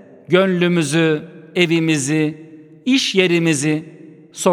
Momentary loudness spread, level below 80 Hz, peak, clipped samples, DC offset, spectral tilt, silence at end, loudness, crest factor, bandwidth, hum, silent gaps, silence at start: 10 LU; -66 dBFS; 0 dBFS; under 0.1%; under 0.1%; -4.5 dB/octave; 0 s; -17 LUFS; 18 dB; 15 kHz; none; none; 0.3 s